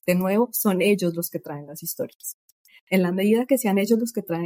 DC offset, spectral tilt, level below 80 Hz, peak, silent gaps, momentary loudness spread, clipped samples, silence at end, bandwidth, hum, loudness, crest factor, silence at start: under 0.1%; -5.5 dB/octave; -70 dBFS; -6 dBFS; 2.15-2.20 s, 2.34-2.65 s, 2.81-2.87 s; 12 LU; under 0.1%; 0 s; 16.5 kHz; none; -23 LUFS; 18 dB; 0.05 s